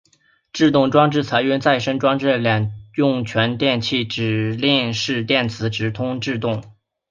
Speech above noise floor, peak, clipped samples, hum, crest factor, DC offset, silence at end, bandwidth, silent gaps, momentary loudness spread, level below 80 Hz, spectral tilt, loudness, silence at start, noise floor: 41 dB; -2 dBFS; under 0.1%; none; 18 dB; under 0.1%; 0.4 s; 7.4 kHz; none; 7 LU; -54 dBFS; -6 dB/octave; -19 LUFS; 0.55 s; -60 dBFS